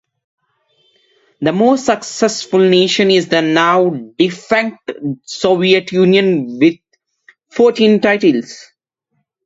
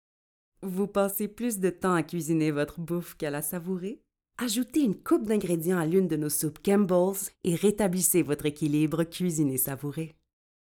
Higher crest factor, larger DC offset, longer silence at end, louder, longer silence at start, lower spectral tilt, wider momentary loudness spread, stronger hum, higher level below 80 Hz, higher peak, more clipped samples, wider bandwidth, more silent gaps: about the same, 14 dB vs 18 dB; neither; first, 0.85 s vs 0.55 s; first, -13 LUFS vs -28 LUFS; first, 1.4 s vs 0.6 s; about the same, -5 dB/octave vs -5.5 dB/octave; about the same, 12 LU vs 10 LU; neither; about the same, -60 dBFS vs -60 dBFS; first, 0 dBFS vs -10 dBFS; neither; second, 8 kHz vs over 20 kHz; neither